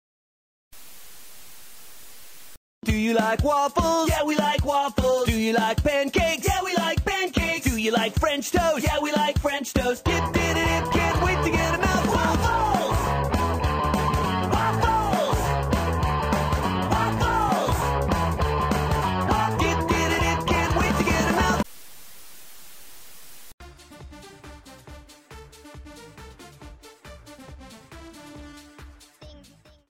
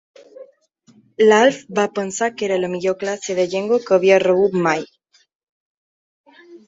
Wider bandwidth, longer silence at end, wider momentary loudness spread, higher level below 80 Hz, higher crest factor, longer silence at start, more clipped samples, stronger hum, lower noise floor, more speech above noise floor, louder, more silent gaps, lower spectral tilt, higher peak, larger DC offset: first, 16 kHz vs 8 kHz; first, 0.5 s vs 0.1 s; first, 23 LU vs 9 LU; first, -34 dBFS vs -64 dBFS; about the same, 18 dB vs 18 dB; first, 0.75 s vs 0.4 s; neither; neither; about the same, -53 dBFS vs -55 dBFS; second, 31 dB vs 38 dB; second, -23 LUFS vs -18 LUFS; second, 2.57-2.82 s, 23.54-23.58 s vs 5.35-6.24 s; about the same, -5 dB/octave vs -4.5 dB/octave; second, -6 dBFS vs -2 dBFS; neither